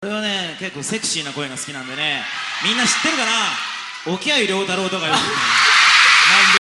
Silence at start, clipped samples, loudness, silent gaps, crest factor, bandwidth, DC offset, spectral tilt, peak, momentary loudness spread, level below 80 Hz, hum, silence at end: 0 s; under 0.1%; -15 LUFS; none; 18 dB; 12.5 kHz; under 0.1%; -1 dB/octave; 0 dBFS; 16 LU; -60 dBFS; none; 0.1 s